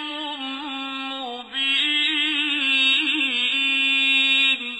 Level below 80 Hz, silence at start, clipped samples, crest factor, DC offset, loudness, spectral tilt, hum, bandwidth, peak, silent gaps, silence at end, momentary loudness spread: -72 dBFS; 0 s; under 0.1%; 14 dB; under 0.1%; -19 LUFS; 0.5 dB/octave; none; 14.5 kHz; -8 dBFS; none; 0 s; 13 LU